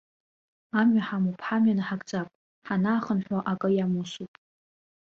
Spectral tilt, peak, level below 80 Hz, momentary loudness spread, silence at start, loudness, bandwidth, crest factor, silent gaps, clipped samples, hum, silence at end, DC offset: -7 dB/octave; -12 dBFS; -68 dBFS; 12 LU; 0.75 s; -27 LUFS; 7.4 kHz; 16 dB; 2.35-2.62 s; under 0.1%; none; 0.85 s; under 0.1%